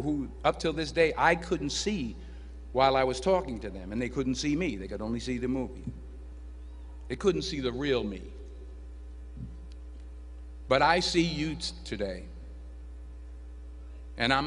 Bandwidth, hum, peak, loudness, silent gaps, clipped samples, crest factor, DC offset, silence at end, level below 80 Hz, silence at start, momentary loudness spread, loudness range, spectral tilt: 10.5 kHz; none; -8 dBFS; -29 LUFS; none; under 0.1%; 24 dB; under 0.1%; 0 s; -44 dBFS; 0 s; 21 LU; 6 LU; -4.5 dB/octave